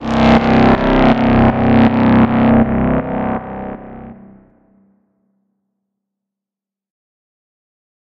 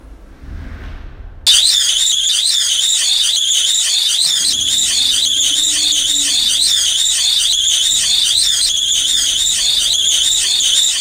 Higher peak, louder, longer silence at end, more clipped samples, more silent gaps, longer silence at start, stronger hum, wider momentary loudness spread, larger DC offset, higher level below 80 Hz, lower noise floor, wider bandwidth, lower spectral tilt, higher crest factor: about the same, -2 dBFS vs 0 dBFS; about the same, -12 LUFS vs -10 LUFS; first, 3.9 s vs 0 s; neither; neither; about the same, 0 s vs 0.05 s; neither; first, 16 LU vs 2 LU; neither; first, -30 dBFS vs -38 dBFS; first, -87 dBFS vs -35 dBFS; second, 6.8 kHz vs 16 kHz; first, -8.5 dB/octave vs 2.5 dB/octave; about the same, 14 dB vs 14 dB